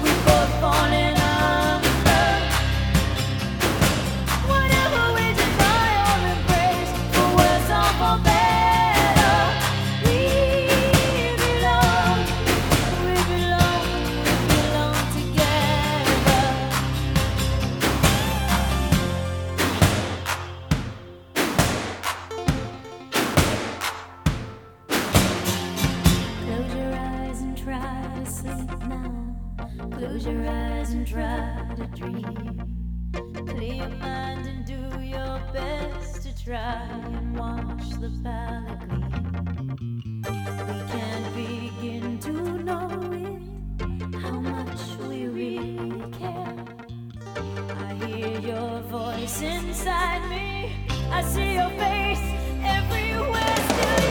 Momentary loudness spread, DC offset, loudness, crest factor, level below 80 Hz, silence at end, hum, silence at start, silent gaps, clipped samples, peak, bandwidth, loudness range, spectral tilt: 15 LU; under 0.1%; -23 LUFS; 22 dB; -32 dBFS; 0 s; none; 0 s; none; under 0.1%; 0 dBFS; 19 kHz; 13 LU; -4.5 dB/octave